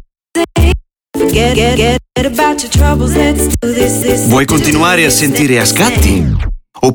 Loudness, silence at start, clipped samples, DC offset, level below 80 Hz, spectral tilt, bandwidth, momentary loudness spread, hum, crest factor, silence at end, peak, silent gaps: -11 LUFS; 0.35 s; under 0.1%; under 0.1%; -18 dBFS; -4.5 dB/octave; 19.5 kHz; 7 LU; none; 10 dB; 0 s; 0 dBFS; none